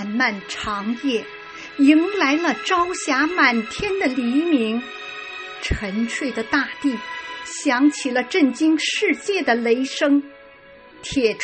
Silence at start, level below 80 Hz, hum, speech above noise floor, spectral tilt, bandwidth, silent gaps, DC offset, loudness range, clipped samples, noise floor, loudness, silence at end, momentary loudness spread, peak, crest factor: 0 s; -42 dBFS; none; 26 dB; -3.5 dB/octave; 8.8 kHz; none; under 0.1%; 4 LU; under 0.1%; -45 dBFS; -20 LUFS; 0 s; 13 LU; -4 dBFS; 18 dB